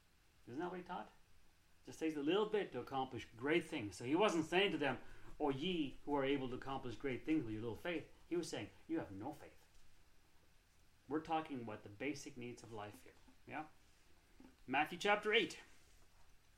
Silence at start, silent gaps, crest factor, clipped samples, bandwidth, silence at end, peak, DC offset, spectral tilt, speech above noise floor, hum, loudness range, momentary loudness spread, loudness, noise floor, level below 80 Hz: 0.45 s; none; 22 dB; under 0.1%; 15.5 kHz; 0.2 s; -20 dBFS; under 0.1%; -5 dB/octave; 28 dB; none; 9 LU; 16 LU; -42 LUFS; -69 dBFS; -66 dBFS